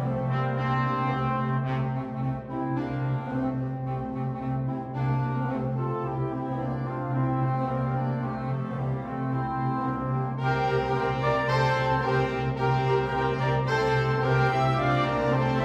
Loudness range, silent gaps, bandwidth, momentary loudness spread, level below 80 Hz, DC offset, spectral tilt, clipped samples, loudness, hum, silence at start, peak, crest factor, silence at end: 5 LU; none; 7.2 kHz; 7 LU; -48 dBFS; under 0.1%; -8 dB/octave; under 0.1%; -27 LUFS; none; 0 s; -12 dBFS; 14 dB; 0 s